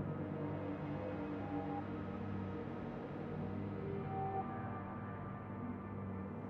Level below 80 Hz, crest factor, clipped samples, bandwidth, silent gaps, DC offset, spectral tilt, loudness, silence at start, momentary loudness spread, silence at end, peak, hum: -64 dBFS; 14 dB; under 0.1%; 6 kHz; none; under 0.1%; -8 dB/octave; -44 LUFS; 0 s; 4 LU; 0 s; -28 dBFS; none